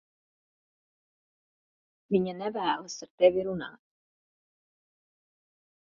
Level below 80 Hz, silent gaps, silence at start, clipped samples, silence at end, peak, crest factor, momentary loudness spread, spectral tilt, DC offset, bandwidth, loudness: -70 dBFS; 3.10-3.18 s; 2.1 s; under 0.1%; 2.1 s; -10 dBFS; 24 dB; 14 LU; -4.5 dB/octave; under 0.1%; 6 kHz; -29 LUFS